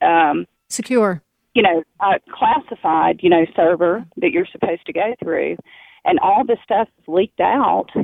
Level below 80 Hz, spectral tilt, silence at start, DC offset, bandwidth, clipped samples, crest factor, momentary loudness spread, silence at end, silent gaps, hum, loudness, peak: -58 dBFS; -5 dB/octave; 0 s; under 0.1%; 14.5 kHz; under 0.1%; 16 dB; 7 LU; 0 s; none; none; -18 LUFS; -2 dBFS